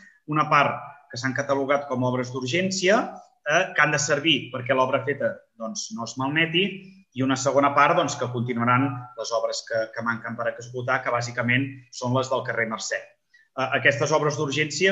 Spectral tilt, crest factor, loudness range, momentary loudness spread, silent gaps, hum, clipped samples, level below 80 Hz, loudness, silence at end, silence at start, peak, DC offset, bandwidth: -4 dB/octave; 20 dB; 4 LU; 12 LU; none; none; under 0.1%; -70 dBFS; -24 LUFS; 0 s; 0.3 s; -4 dBFS; under 0.1%; 8.4 kHz